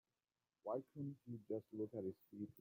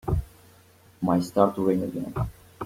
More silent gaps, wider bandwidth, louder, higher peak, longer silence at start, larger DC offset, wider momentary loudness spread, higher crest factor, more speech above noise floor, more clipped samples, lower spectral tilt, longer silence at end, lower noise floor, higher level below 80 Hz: neither; about the same, 16.5 kHz vs 16.5 kHz; second, -50 LUFS vs -26 LUFS; second, -32 dBFS vs -4 dBFS; first, 0.65 s vs 0.05 s; neither; second, 7 LU vs 10 LU; about the same, 18 dB vs 22 dB; first, over 41 dB vs 31 dB; neither; first, -11 dB/octave vs -8 dB/octave; about the same, 0 s vs 0 s; first, under -90 dBFS vs -55 dBFS; second, -88 dBFS vs -42 dBFS